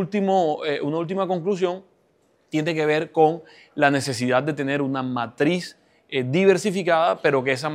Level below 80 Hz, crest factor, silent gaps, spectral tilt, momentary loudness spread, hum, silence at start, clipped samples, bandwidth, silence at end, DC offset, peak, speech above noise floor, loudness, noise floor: -72 dBFS; 20 dB; none; -5.5 dB/octave; 9 LU; none; 0 s; under 0.1%; 15 kHz; 0 s; under 0.1%; -2 dBFS; 41 dB; -22 LUFS; -63 dBFS